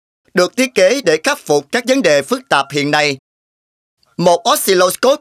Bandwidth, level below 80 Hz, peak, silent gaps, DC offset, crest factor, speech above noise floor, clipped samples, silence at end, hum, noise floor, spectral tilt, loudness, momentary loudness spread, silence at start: 16 kHz; -64 dBFS; 0 dBFS; 3.19-3.97 s; under 0.1%; 14 dB; over 77 dB; under 0.1%; 0.05 s; none; under -90 dBFS; -3.5 dB/octave; -14 LUFS; 5 LU; 0.35 s